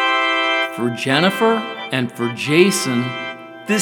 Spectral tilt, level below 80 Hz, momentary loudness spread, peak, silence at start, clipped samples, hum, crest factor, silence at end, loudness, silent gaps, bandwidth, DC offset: -4 dB/octave; -78 dBFS; 10 LU; 0 dBFS; 0 s; under 0.1%; none; 18 dB; 0 s; -18 LUFS; none; over 20 kHz; under 0.1%